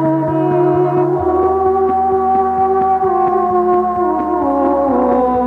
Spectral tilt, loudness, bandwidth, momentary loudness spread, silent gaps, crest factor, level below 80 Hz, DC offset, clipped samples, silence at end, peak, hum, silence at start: -10.5 dB/octave; -14 LUFS; 4 kHz; 2 LU; none; 12 dB; -40 dBFS; under 0.1%; under 0.1%; 0 s; -2 dBFS; none; 0 s